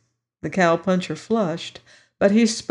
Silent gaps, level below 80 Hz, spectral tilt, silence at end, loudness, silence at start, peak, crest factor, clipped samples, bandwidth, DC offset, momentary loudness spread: none; -62 dBFS; -5 dB/octave; 0.05 s; -21 LUFS; 0.45 s; -4 dBFS; 16 dB; under 0.1%; 11 kHz; under 0.1%; 14 LU